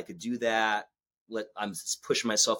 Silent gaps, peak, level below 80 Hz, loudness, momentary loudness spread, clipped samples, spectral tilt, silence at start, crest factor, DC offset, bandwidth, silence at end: 1.17-1.26 s; -12 dBFS; -76 dBFS; -30 LUFS; 11 LU; under 0.1%; -1.5 dB/octave; 0 s; 18 dB; under 0.1%; 17 kHz; 0 s